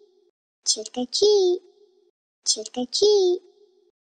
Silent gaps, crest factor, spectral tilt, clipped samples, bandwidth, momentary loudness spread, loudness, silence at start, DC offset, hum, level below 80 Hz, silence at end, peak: 2.10-2.42 s; 18 dB; -1 dB/octave; under 0.1%; 9.8 kHz; 10 LU; -22 LUFS; 0.65 s; under 0.1%; none; -70 dBFS; 0.8 s; -6 dBFS